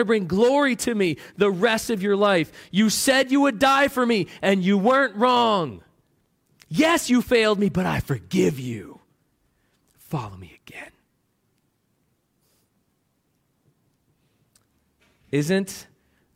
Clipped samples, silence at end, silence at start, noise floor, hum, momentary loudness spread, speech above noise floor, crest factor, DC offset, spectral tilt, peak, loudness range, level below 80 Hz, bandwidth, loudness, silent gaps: under 0.1%; 0.55 s; 0 s; -70 dBFS; none; 14 LU; 49 dB; 16 dB; under 0.1%; -4.5 dB/octave; -6 dBFS; 20 LU; -54 dBFS; 16.5 kHz; -21 LUFS; none